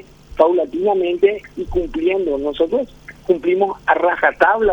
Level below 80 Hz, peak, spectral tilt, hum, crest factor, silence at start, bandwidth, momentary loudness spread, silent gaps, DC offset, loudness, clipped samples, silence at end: -40 dBFS; 0 dBFS; -6.5 dB/octave; none; 16 dB; 0.3 s; 6.8 kHz; 9 LU; none; under 0.1%; -18 LUFS; under 0.1%; 0 s